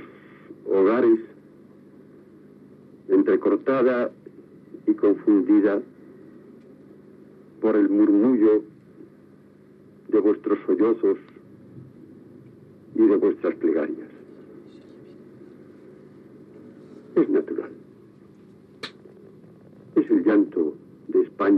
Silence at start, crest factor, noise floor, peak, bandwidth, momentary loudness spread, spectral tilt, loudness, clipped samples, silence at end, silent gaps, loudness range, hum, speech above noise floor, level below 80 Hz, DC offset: 0 s; 16 dB; -51 dBFS; -10 dBFS; 4.7 kHz; 19 LU; -9 dB/octave; -22 LUFS; under 0.1%; 0 s; none; 8 LU; 50 Hz at -65 dBFS; 31 dB; -76 dBFS; under 0.1%